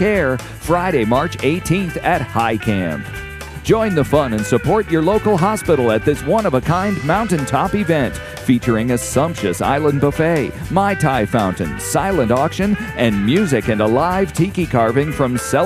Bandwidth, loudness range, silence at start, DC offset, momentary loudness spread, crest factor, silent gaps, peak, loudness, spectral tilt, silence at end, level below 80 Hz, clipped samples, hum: 15.5 kHz; 2 LU; 0 s; under 0.1%; 4 LU; 16 dB; none; 0 dBFS; -17 LUFS; -6 dB/octave; 0 s; -36 dBFS; under 0.1%; none